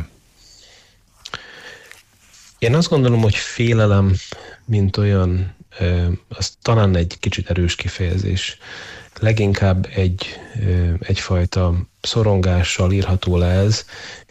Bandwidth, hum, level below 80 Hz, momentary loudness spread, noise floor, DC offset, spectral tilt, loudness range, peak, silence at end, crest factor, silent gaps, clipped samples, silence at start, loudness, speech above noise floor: 8.4 kHz; none; -34 dBFS; 18 LU; -51 dBFS; under 0.1%; -6 dB/octave; 3 LU; -6 dBFS; 0.1 s; 14 dB; none; under 0.1%; 0 s; -18 LUFS; 34 dB